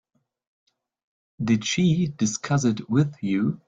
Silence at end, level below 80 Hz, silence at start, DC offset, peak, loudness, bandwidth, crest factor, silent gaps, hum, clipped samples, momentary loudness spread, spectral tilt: 0.1 s; -60 dBFS; 1.4 s; under 0.1%; -8 dBFS; -24 LUFS; 9.2 kHz; 18 dB; none; none; under 0.1%; 4 LU; -5.5 dB/octave